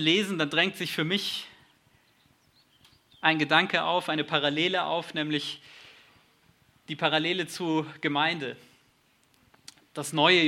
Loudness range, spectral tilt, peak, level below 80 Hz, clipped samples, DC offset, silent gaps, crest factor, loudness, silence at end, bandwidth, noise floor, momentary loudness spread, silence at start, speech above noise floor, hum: 4 LU; -4 dB/octave; -6 dBFS; -76 dBFS; under 0.1%; under 0.1%; none; 22 dB; -27 LUFS; 0 s; 16 kHz; -66 dBFS; 15 LU; 0 s; 39 dB; none